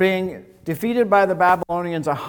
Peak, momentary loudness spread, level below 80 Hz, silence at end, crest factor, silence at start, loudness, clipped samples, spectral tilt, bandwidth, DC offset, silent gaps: -2 dBFS; 13 LU; -56 dBFS; 0 s; 16 dB; 0 s; -20 LUFS; under 0.1%; -6.5 dB/octave; 19 kHz; under 0.1%; none